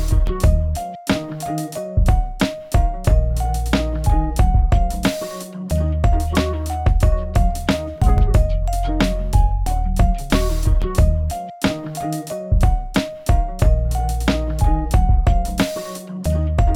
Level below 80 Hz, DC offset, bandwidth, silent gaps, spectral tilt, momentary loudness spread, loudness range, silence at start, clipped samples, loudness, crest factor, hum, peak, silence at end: -18 dBFS; under 0.1%; 16 kHz; none; -6.5 dB/octave; 7 LU; 2 LU; 0 s; under 0.1%; -20 LUFS; 14 dB; none; -2 dBFS; 0 s